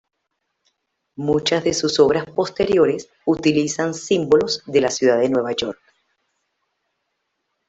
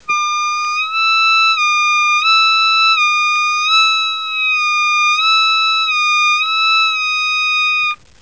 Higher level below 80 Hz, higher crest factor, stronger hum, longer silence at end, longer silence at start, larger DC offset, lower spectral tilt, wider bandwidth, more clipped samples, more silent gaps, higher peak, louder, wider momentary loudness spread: first, -54 dBFS vs -64 dBFS; first, 18 dB vs 12 dB; neither; first, 1.95 s vs 0.25 s; first, 1.2 s vs 0.1 s; second, under 0.1% vs 0.4%; first, -4.5 dB/octave vs 4.5 dB/octave; about the same, 8.2 kHz vs 8 kHz; neither; neither; about the same, -2 dBFS vs -2 dBFS; second, -19 LUFS vs -12 LUFS; about the same, 7 LU vs 6 LU